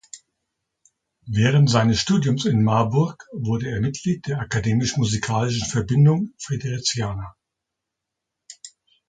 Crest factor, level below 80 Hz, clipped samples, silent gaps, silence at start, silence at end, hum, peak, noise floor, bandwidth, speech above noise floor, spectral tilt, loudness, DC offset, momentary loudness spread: 20 dB; -48 dBFS; under 0.1%; none; 0.15 s; 0.4 s; none; -2 dBFS; -83 dBFS; 9.4 kHz; 63 dB; -5.5 dB/octave; -21 LUFS; under 0.1%; 14 LU